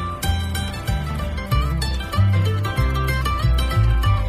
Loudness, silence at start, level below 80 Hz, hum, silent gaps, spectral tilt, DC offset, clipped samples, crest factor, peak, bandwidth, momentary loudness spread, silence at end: -21 LUFS; 0 s; -24 dBFS; none; none; -5.5 dB/octave; under 0.1%; under 0.1%; 12 dB; -6 dBFS; 16 kHz; 7 LU; 0 s